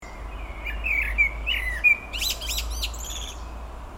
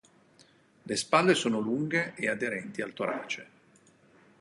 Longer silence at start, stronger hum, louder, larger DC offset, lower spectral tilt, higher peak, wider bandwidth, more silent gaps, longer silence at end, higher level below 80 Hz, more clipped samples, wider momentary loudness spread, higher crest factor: second, 0 s vs 0.85 s; neither; first, -24 LUFS vs -29 LUFS; neither; second, -1.5 dB/octave vs -4 dB/octave; about the same, -10 dBFS vs -8 dBFS; first, 16.5 kHz vs 11.5 kHz; neither; second, 0 s vs 0.95 s; first, -34 dBFS vs -74 dBFS; neither; first, 19 LU vs 12 LU; second, 18 dB vs 24 dB